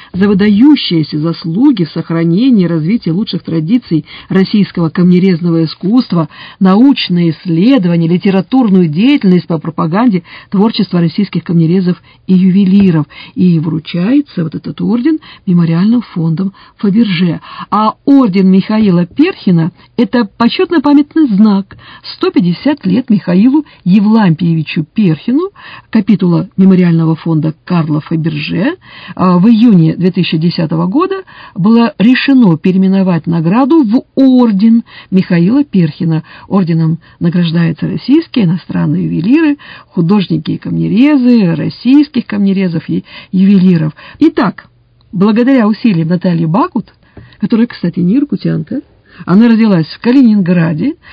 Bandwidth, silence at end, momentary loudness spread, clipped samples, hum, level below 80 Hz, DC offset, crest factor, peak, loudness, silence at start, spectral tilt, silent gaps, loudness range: 5.2 kHz; 0.2 s; 8 LU; 0.7%; none; -48 dBFS; under 0.1%; 10 dB; 0 dBFS; -10 LUFS; 0.15 s; -10 dB/octave; none; 3 LU